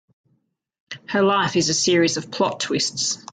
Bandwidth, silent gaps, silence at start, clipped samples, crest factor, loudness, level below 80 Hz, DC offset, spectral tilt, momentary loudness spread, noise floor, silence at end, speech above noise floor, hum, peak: 9.6 kHz; none; 0.9 s; under 0.1%; 16 dB; -20 LUFS; -62 dBFS; under 0.1%; -3 dB/octave; 7 LU; -69 dBFS; 0.1 s; 48 dB; none; -6 dBFS